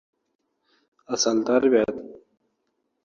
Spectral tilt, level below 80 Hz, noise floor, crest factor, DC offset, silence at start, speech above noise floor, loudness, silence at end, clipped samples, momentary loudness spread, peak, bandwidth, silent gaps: -3 dB/octave; -66 dBFS; -75 dBFS; 20 dB; under 0.1%; 1.1 s; 53 dB; -22 LUFS; 0.9 s; under 0.1%; 17 LU; -6 dBFS; 7.6 kHz; none